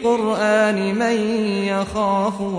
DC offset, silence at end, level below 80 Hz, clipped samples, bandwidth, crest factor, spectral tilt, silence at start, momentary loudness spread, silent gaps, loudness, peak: under 0.1%; 0 s; -50 dBFS; under 0.1%; 10.5 kHz; 12 dB; -5.5 dB/octave; 0 s; 4 LU; none; -19 LUFS; -6 dBFS